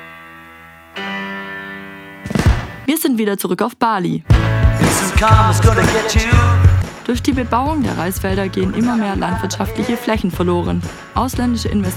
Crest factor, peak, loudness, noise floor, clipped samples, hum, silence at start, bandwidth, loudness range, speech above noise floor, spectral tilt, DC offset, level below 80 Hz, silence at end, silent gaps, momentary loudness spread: 16 dB; 0 dBFS; -16 LUFS; -40 dBFS; under 0.1%; none; 0 s; 16.5 kHz; 6 LU; 25 dB; -5.5 dB/octave; under 0.1%; -24 dBFS; 0 s; none; 14 LU